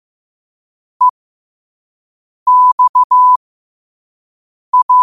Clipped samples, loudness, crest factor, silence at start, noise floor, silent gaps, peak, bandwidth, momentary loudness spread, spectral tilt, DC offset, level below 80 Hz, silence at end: under 0.1%; -11 LUFS; 12 dB; 1 s; under -90 dBFS; 1.10-2.46 s, 2.72-2.78 s, 2.89-2.94 s, 3.04-3.10 s, 3.36-4.73 s, 4.83-4.89 s; -4 dBFS; 1.3 kHz; 6 LU; -1 dB/octave; 0.3%; -68 dBFS; 0 s